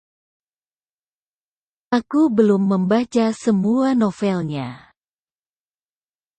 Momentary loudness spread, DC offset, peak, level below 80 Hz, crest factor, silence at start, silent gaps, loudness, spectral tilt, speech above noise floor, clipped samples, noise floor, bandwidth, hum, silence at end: 8 LU; under 0.1%; -4 dBFS; -62 dBFS; 18 dB; 1.9 s; none; -19 LUFS; -7.5 dB/octave; over 72 dB; under 0.1%; under -90 dBFS; 9 kHz; none; 1.6 s